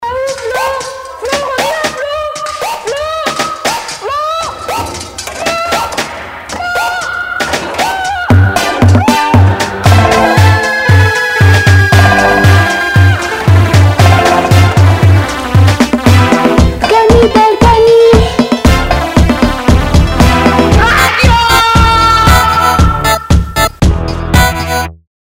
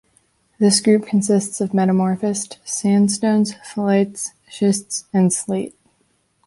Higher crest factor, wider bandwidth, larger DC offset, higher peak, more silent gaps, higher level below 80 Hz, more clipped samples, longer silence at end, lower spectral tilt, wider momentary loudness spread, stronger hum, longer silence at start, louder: second, 8 dB vs 16 dB; first, 16.5 kHz vs 11.5 kHz; neither; first, 0 dBFS vs -4 dBFS; neither; first, -18 dBFS vs -62 dBFS; first, 1% vs under 0.1%; second, 0.45 s vs 0.75 s; about the same, -5.5 dB/octave vs -5 dB/octave; about the same, 10 LU vs 9 LU; neither; second, 0 s vs 0.6 s; first, -9 LUFS vs -19 LUFS